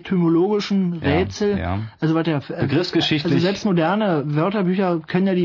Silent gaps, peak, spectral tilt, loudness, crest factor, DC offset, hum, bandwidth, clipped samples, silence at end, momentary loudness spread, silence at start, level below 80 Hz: none; -4 dBFS; -7 dB/octave; -20 LUFS; 14 dB; under 0.1%; none; 6 kHz; under 0.1%; 0 s; 3 LU; 0.05 s; -52 dBFS